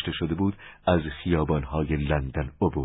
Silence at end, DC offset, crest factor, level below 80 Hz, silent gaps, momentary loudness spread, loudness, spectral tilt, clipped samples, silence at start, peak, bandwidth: 0 s; under 0.1%; 18 dB; -36 dBFS; none; 4 LU; -27 LUFS; -11.5 dB/octave; under 0.1%; 0 s; -8 dBFS; 4 kHz